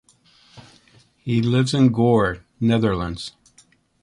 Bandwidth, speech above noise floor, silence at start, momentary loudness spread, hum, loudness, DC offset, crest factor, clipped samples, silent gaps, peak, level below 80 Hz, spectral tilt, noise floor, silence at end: 11 kHz; 38 dB; 0.55 s; 15 LU; none; -20 LUFS; under 0.1%; 16 dB; under 0.1%; none; -6 dBFS; -46 dBFS; -7 dB/octave; -57 dBFS; 0.75 s